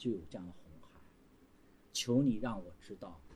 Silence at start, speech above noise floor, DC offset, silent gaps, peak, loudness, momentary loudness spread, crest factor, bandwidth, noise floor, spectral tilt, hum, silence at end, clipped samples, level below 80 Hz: 0 s; 27 dB; under 0.1%; none; -20 dBFS; -37 LUFS; 20 LU; 20 dB; 15 kHz; -64 dBFS; -5 dB/octave; none; 0 s; under 0.1%; -62 dBFS